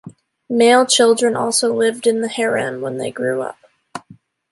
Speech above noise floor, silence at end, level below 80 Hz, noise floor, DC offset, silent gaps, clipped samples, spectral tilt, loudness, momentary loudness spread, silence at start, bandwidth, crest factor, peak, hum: 31 dB; 0.4 s; -66 dBFS; -47 dBFS; under 0.1%; none; under 0.1%; -2.5 dB/octave; -16 LUFS; 19 LU; 0.05 s; 11.5 kHz; 16 dB; -2 dBFS; none